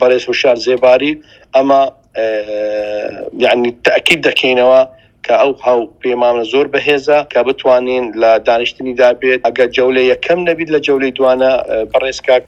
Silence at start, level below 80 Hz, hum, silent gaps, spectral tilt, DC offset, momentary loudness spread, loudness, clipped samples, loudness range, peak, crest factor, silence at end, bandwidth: 0 s; -50 dBFS; none; none; -4 dB/octave; under 0.1%; 8 LU; -12 LUFS; 0.1%; 2 LU; 0 dBFS; 12 dB; 0.05 s; 14 kHz